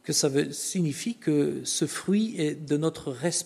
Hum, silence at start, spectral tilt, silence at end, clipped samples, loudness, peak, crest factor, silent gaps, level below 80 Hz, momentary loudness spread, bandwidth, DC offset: none; 0.05 s; -4.5 dB/octave; 0 s; under 0.1%; -27 LUFS; -12 dBFS; 16 dB; none; -68 dBFS; 5 LU; 13.5 kHz; under 0.1%